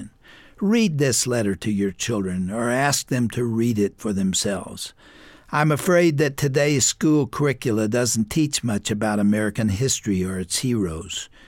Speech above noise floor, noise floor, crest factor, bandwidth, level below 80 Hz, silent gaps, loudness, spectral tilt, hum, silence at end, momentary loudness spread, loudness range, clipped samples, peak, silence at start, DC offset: 27 dB; -49 dBFS; 16 dB; 17 kHz; -50 dBFS; none; -21 LUFS; -4.5 dB/octave; none; 0.2 s; 8 LU; 3 LU; under 0.1%; -6 dBFS; 0 s; under 0.1%